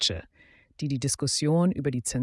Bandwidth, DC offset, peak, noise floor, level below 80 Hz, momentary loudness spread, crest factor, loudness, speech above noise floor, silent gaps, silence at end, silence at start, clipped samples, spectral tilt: 12 kHz; under 0.1%; -12 dBFS; -59 dBFS; -54 dBFS; 10 LU; 16 dB; -26 LUFS; 33 dB; none; 0 s; 0 s; under 0.1%; -4.5 dB/octave